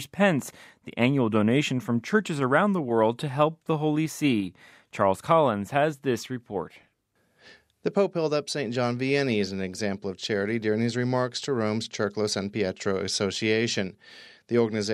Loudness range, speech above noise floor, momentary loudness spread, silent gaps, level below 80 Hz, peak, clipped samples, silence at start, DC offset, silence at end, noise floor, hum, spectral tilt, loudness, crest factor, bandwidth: 4 LU; 44 dB; 8 LU; none; -70 dBFS; -6 dBFS; under 0.1%; 0 s; under 0.1%; 0 s; -70 dBFS; none; -5.5 dB/octave; -26 LUFS; 20 dB; 15 kHz